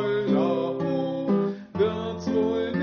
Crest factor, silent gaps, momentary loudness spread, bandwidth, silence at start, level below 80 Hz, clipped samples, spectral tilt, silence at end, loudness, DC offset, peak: 14 dB; none; 4 LU; 6.8 kHz; 0 s; -58 dBFS; under 0.1%; -6.5 dB/octave; 0 s; -26 LUFS; under 0.1%; -10 dBFS